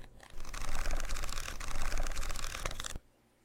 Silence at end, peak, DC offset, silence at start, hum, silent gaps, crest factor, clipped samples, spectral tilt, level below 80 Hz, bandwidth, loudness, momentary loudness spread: 0.45 s; -18 dBFS; under 0.1%; 0 s; none; none; 14 dB; under 0.1%; -2.5 dB/octave; -36 dBFS; 16 kHz; -41 LUFS; 8 LU